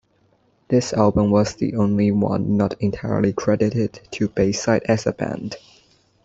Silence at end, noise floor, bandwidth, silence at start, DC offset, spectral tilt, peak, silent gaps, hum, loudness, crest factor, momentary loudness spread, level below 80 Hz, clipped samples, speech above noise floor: 0.65 s; -61 dBFS; 8 kHz; 0.7 s; under 0.1%; -6.5 dB/octave; -2 dBFS; none; none; -20 LUFS; 20 dB; 9 LU; -48 dBFS; under 0.1%; 42 dB